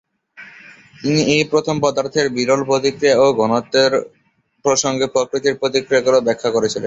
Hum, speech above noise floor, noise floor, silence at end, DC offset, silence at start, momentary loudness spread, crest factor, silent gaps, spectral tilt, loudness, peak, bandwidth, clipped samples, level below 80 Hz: none; 27 dB; -43 dBFS; 0 s; under 0.1%; 0.4 s; 5 LU; 16 dB; none; -4 dB/octave; -17 LUFS; -2 dBFS; 8 kHz; under 0.1%; -56 dBFS